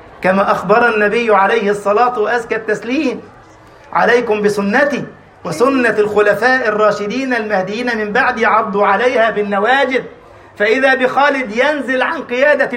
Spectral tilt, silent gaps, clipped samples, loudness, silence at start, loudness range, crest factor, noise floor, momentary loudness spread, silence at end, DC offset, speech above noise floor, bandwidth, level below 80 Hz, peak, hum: -5 dB/octave; none; under 0.1%; -14 LUFS; 0 s; 2 LU; 14 dB; -41 dBFS; 6 LU; 0 s; under 0.1%; 27 dB; 16 kHz; -52 dBFS; 0 dBFS; none